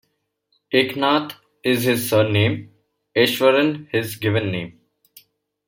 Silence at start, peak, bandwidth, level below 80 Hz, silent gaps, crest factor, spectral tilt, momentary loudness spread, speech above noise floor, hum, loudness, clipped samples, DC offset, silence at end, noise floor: 0.7 s; -2 dBFS; 16.5 kHz; -60 dBFS; none; 18 dB; -5 dB/octave; 10 LU; 51 dB; none; -20 LUFS; under 0.1%; under 0.1%; 0.95 s; -70 dBFS